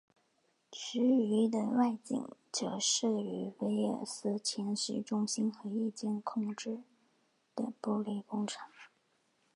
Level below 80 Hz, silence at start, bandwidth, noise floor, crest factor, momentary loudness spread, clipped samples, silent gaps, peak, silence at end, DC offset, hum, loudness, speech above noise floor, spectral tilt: -84 dBFS; 0.7 s; 11 kHz; -76 dBFS; 18 dB; 11 LU; under 0.1%; none; -18 dBFS; 0.7 s; under 0.1%; none; -35 LUFS; 41 dB; -4 dB/octave